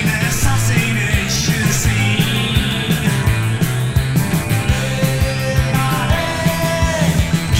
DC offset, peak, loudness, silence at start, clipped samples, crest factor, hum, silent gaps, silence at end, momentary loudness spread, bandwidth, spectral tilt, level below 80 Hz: under 0.1%; -2 dBFS; -16 LUFS; 0 s; under 0.1%; 14 dB; none; none; 0 s; 2 LU; 16.5 kHz; -4.5 dB/octave; -26 dBFS